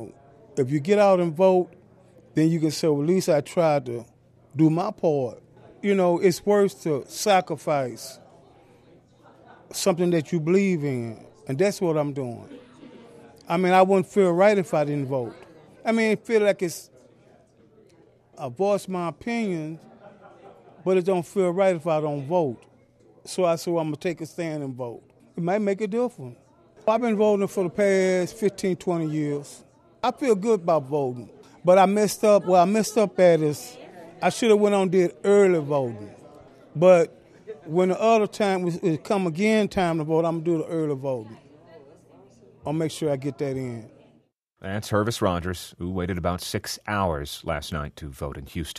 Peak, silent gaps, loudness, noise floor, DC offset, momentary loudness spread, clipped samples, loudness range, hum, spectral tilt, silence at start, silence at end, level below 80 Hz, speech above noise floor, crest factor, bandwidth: -4 dBFS; none; -23 LUFS; -63 dBFS; under 0.1%; 16 LU; under 0.1%; 8 LU; none; -6 dB/octave; 0 s; 0 s; -54 dBFS; 41 dB; 18 dB; 13.5 kHz